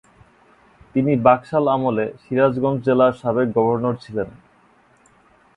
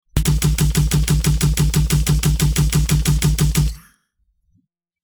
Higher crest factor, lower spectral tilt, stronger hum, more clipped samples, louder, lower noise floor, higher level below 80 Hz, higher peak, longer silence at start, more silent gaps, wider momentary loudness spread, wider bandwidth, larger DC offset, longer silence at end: first, 20 dB vs 14 dB; first, -9 dB/octave vs -5 dB/octave; neither; neither; about the same, -19 LUFS vs -18 LUFS; second, -55 dBFS vs -66 dBFS; second, -54 dBFS vs -22 dBFS; first, 0 dBFS vs -4 dBFS; first, 0.95 s vs 0.15 s; neither; first, 10 LU vs 1 LU; second, 9.6 kHz vs over 20 kHz; neither; about the same, 1.25 s vs 1.25 s